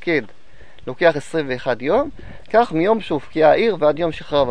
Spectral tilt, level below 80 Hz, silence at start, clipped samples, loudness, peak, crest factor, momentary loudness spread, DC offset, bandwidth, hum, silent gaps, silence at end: -6.5 dB/octave; -46 dBFS; 0.05 s; under 0.1%; -19 LUFS; -2 dBFS; 18 dB; 9 LU; 2%; 10 kHz; none; none; 0 s